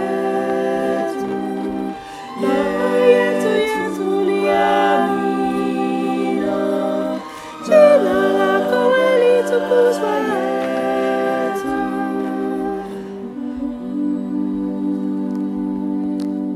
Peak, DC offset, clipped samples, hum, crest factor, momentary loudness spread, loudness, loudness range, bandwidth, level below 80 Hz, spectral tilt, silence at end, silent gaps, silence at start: 0 dBFS; under 0.1%; under 0.1%; none; 16 dB; 11 LU; -18 LUFS; 8 LU; 14.5 kHz; -54 dBFS; -6 dB/octave; 0 s; none; 0 s